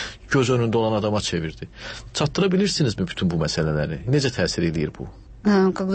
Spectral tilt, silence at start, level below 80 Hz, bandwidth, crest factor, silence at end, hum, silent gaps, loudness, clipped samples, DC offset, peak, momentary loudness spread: -5.5 dB/octave; 0 s; -42 dBFS; 8.8 kHz; 14 dB; 0 s; none; none; -22 LUFS; under 0.1%; under 0.1%; -8 dBFS; 12 LU